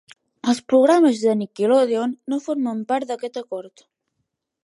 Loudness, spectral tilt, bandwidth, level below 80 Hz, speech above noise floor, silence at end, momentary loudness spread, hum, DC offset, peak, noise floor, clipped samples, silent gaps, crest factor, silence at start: -20 LUFS; -5.5 dB/octave; 11.5 kHz; -74 dBFS; 57 dB; 0.95 s; 14 LU; none; under 0.1%; -6 dBFS; -77 dBFS; under 0.1%; none; 16 dB; 0.45 s